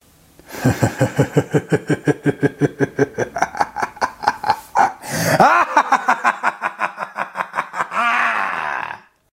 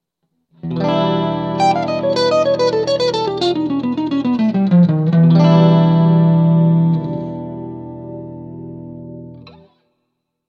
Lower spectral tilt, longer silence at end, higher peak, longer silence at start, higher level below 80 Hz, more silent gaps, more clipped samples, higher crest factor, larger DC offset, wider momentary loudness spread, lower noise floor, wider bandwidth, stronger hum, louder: second, -5.5 dB/octave vs -8 dB/octave; second, 0.35 s vs 1 s; about the same, 0 dBFS vs 0 dBFS; second, 0.5 s vs 0.65 s; about the same, -54 dBFS vs -52 dBFS; neither; neither; about the same, 18 dB vs 16 dB; neither; second, 9 LU vs 20 LU; second, -48 dBFS vs -72 dBFS; first, 16 kHz vs 7.4 kHz; neither; second, -19 LUFS vs -14 LUFS